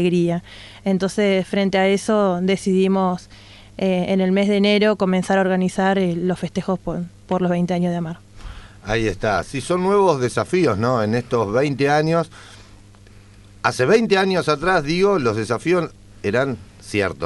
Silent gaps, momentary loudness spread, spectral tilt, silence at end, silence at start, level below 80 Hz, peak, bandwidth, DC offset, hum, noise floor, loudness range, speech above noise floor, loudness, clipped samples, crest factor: none; 11 LU; -6 dB/octave; 0 s; 0 s; -46 dBFS; -2 dBFS; 11.5 kHz; under 0.1%; none; -45 dBFS; 3 LU; 26 dB; -19 LUFS; under 0.1%; 18 dB